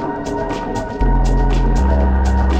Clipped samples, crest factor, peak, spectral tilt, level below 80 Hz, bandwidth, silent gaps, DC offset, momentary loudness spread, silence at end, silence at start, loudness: under 0.1%; 12 dB; -4 dBFS; -7.5 dB/octave; -16 dBFS; 8.4 kHz; none; under 0.1%; 6 LU; 0 s; 0 s; -18 LUFS